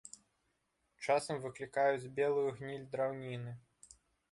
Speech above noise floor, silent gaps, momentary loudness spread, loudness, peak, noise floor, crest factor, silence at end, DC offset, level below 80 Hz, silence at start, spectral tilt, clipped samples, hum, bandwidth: 45 dB; none; 15 LU; -37 LUFS; -20 dBFS; -81 dBFS; 20 dB; 0.7 s; under 0.1%; -76 dBFS; 0.05 s; -5 dB/octave; under 0.1%; none; 11.5 kHz